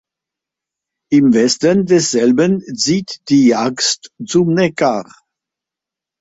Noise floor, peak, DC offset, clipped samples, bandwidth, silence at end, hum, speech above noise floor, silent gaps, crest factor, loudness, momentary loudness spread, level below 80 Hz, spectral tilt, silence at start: -86 dBFS; -2 dBFS; under 0.1%; under 0.1%; 8 kHz; 1.2 s; none; 72 dB; none; 14 dB; -14 LUFS; 5 LU; -56 dBFS; -4.5 dB/octave; 1.1 s